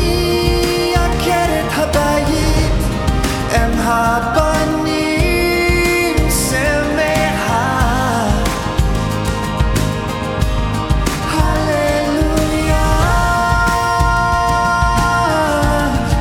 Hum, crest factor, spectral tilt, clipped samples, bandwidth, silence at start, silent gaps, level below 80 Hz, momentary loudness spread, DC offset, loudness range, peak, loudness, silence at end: none; 14 dB; -5 dB/octave; under 0.1%; 17.5 kHz; 0 s; none; -20 dBFS; 4 LU; under 0.1%; 3 LU; 0 dBFS; -15 LUFS; 0 s